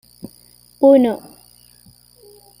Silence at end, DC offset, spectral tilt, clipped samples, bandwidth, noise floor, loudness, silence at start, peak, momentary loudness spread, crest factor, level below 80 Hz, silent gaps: 1.45 s; under 0.1%; -6.5 dB/octave; under 0.1%; 16 kHz; -50 dBFS; -14 LUFS; 0.25 s; -2 dBFS; 27 LU; 18 dB; -62 dBFS; none